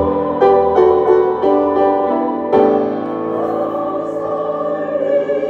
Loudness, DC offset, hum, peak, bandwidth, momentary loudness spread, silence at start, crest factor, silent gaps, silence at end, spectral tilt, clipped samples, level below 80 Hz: -15 LUFS; under 0.1%; none; 0 dBFS; 5.8 kHz; 8 LU; 0 s; 14 dB; none; 0 s; -8.5 dB/octave; under 0.1%; -50 dBFS